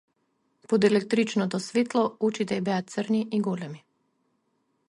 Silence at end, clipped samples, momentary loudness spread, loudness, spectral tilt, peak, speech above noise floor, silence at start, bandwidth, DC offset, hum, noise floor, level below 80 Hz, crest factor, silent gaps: 1.1 s; under 0.1%; 8 LU; -26 LUFS; -6 dB/octave; -10 dBFS; 48 dB; 0.7 s; 11.5 kHz; under 0.1%; none; -73 dBFS; -72 dBFS; 18 dB; none